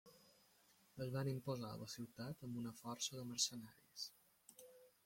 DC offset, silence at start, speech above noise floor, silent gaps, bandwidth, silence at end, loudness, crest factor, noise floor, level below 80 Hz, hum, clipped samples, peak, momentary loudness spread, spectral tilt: under 0.1%; 0.05 s; 27 dB; none; 16.5 kHz; 0.2 s; -47 LUFS; 24 dB; -74 dBFS; -80 dBFS; none; under 0.1%; -26 dBFS; 22 LU; -4 dB/octave